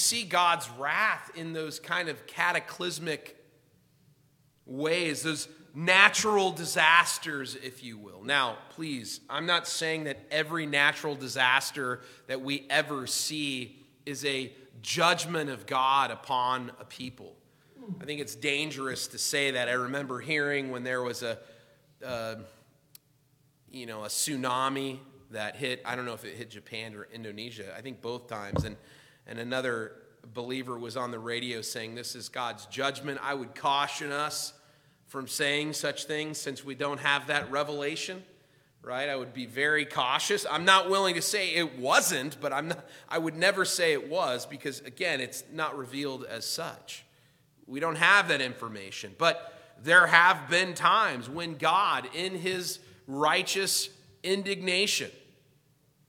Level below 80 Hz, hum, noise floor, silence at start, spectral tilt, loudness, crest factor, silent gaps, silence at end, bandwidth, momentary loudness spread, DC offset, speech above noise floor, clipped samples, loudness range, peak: -68 dBFS; none; -67 dBFS; 0 s; -2.5 dB/octave; -28 LUFS; 28 dB; none; 0.9 s; 18.5 kHz; 17 LU; under 0.1%; 37 dB; under 0.1%; 11 LU; -2 dBFS